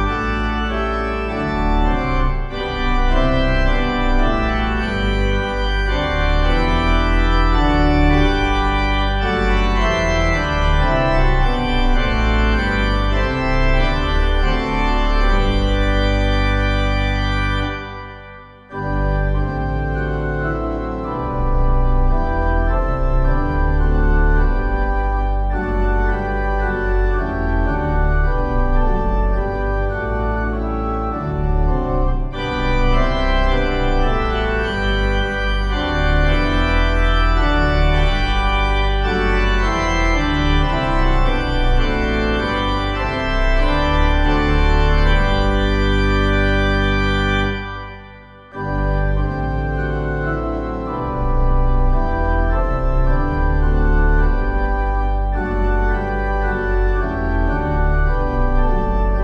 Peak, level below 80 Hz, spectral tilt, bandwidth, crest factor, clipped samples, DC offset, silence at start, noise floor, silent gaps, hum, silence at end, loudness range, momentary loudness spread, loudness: -2 dBFS; -18 dBFS; -6.5 dB/octave; 7.4 kHz; 14 dB; under 0.1%; under 0.1%; 0 s; -40 dBFS; none; none; 0 s; 4 LU; 5 LU; -19 LUFS